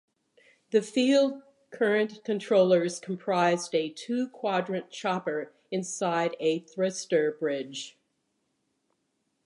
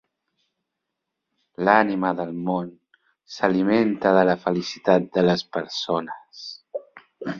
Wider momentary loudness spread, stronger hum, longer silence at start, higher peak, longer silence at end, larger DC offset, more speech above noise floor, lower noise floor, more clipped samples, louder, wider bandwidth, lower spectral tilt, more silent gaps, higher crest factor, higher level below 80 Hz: second, 11 LU vs 18 LU; neither; second, 0.7 s vs 1.6 s; second, -12 dBFS vs -2 dBFS; first, 1.55 s vs 0 s; neither; second, 50 dB vs 60 dB; second, -77 dBFS vs -82 dBFS; neither; second, -28 LUFS vs -22 LUFS; first, 11 kHz vs 7.4 kHz; second, -4.5 dB/octave vs -6 dB/octave; neither; about the same, 18 dB vs 22 dB; second, -84 dBFS vs -64 dBFS